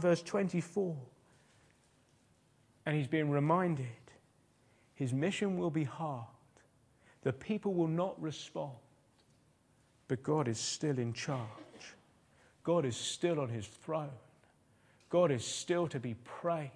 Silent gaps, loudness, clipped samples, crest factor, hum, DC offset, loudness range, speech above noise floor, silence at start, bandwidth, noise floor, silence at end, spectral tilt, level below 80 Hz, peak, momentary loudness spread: none; -36 LUFS; under 0.1%; 20 dB; none; under 0.1%; 3 LU; 35 dB; 0 s; 10.5 kHz; -70 dBFS; 0.05 s; -5.5 dB/octave; -76 dBFS; -16 dBFS; 14 LU